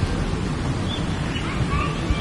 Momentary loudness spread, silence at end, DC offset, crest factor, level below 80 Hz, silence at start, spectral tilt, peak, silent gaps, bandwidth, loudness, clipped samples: 2 LU; 0 s; under 0.1%; 16 dB; -30 dBFS; 0 s; -6 dB/octave; -8 dBFS; none; 11.5 kHz; -25 LUFS; under 0.1%